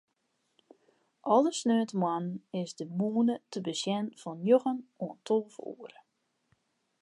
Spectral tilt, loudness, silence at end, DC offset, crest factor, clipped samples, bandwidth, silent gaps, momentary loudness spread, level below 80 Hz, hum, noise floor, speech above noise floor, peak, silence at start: -5.5 dB/octave; -31 LUFS; 1.15 s; under 0.1%; 20 dB; under 0.1%; 11.5 kHz; none; 15 LU; -86 dBFS; none; -78 dBFS; 48 dB; -12 dBFS; 1.25 s